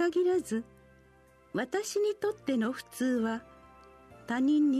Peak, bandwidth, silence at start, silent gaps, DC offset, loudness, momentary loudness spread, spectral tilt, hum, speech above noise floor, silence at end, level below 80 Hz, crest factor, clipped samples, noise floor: -18 dBFS; 13.5 kHz; 0 s; none; under 0.1%; -31 LUFS; 10 LU; -4.5 dB/octave; none; 31 dB; 0 s; -68 dBFS; 12 dB; under 0.1%; -60 dBFS